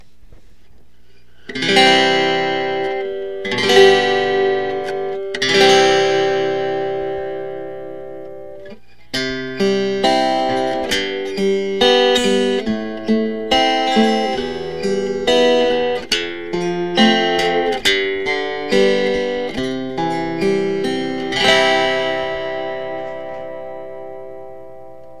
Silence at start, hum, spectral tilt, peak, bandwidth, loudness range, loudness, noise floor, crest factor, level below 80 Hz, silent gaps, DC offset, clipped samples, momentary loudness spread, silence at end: 0.3 s; 60 Hz at -55 dBFS; -3.5 dB/octave; 0 dBFS; 14 kHz; 6 LU; -16 LUFS; -53 dBFS; 18 dB; -48 dBFS; none; 2%; under 0.1%; 17 LU; 0 s